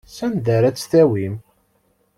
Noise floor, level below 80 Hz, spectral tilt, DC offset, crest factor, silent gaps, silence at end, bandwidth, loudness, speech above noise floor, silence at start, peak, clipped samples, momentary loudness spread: -63 dBFS; -54 dBFS; -7 dB/octave; under 0.1%; 16 dB; none; 0.8 s; 14 kHz; -18 LUFS; 46 dB; 0.1 s; -4 dBFS; under 0.1%; 12 LU